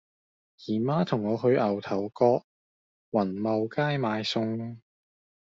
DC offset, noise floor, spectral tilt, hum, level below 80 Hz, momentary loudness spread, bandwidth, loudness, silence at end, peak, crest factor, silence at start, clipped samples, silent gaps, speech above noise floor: under 0.1%; under -90 dBFS; -5.5 dB/octave; none; -70 dBFS; 8 LU; 7.6 kHz; -27 LUFS; 0.65 s; -8 dBFS; 20 dB; 0.6 s; under 0.1%; 2.44-3.12 s; over 64 dB